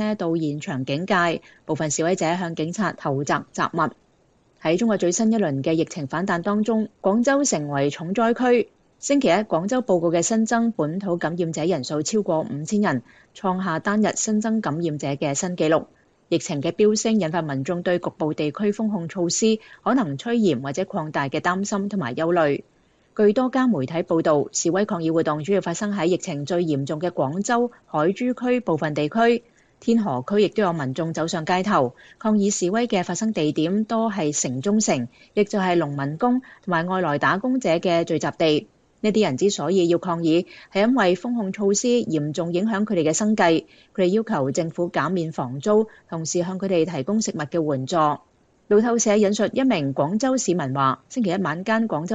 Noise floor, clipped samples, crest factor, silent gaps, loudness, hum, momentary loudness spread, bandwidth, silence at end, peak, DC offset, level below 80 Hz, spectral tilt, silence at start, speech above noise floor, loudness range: -61 dBFS; under 0.1%; 18 dB; none; -22 LUFS; none; 6 LU; 9.2 kHz; 0 s; -4 dBFS; under 0.1%; -64 dBFS; -5 dB/octave; 0 s; 39 dB; 2 LU